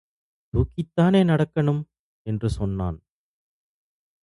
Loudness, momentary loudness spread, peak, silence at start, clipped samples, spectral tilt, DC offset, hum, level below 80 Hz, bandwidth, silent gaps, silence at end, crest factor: -24 LUFS; 15 LU; -6 dBFS; 0.55 s; under 0.1%; -8.5 dB/octave; under 0.1%; none; -40 dBFS; 11.5 kHz; 1.99-2.25 s; 1.25 s; 18 dB